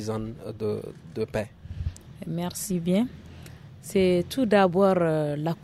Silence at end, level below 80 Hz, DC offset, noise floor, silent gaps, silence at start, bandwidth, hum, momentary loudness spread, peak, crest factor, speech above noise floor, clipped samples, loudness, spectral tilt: 0 s; -48 dBFS; under 0.1%; -45 dBFS; none; 0 s; 14.5 kHz; none; 19 LU; -8 dBFS; 18 dB; 19 dB; under 0.1%; -26 LUFS; -6 dB/octave